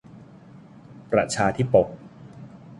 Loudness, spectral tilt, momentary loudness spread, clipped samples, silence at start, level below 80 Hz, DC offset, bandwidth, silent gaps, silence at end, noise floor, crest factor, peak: -22 LUFS; -5.5 dB/octave; 24 LU; under 0.1%; 0.15 s; -54 dBFS; under 0.1%; 11.5 kHz; none; 0.05 s; -47 dBFS; 22 dB; -4 dBFS